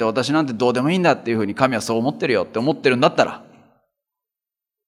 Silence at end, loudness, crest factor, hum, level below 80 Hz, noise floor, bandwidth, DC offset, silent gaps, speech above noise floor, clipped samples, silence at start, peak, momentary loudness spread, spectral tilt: 1.5 s; -19 LUFS; 20 dB; none; -68 dBFS; -89 dBFS; 15 kHz; under 0.1%; none; 70 dB; under 0.1%; 0 s; 0 dBFS; 5 LU; -5.5 dB/octave